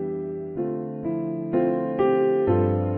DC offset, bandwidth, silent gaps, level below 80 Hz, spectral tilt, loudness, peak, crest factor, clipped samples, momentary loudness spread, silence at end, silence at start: under 0.1%; 3.4 kHz; none; -58 dBFS; -12 dB/octave; -24 LUFS; -8 dBFS; 14 dB; under 0.1%; 9 LU; 0 s; 0 s